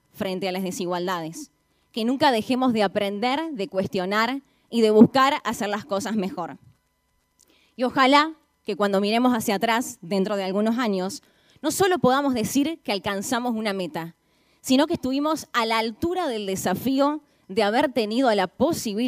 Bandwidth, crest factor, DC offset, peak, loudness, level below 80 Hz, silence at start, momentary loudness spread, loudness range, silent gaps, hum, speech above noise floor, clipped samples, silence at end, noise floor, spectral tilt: 15.5 kHz; 24 dB; under 0.1%; 0 dBFS; -23 LUFS; -62 dBFS; 0.15 s; 11 LU; 3 LU; none; none; 47 dB; under 0.1%; 0 s; -70 dBFS; -4.5 dB/octave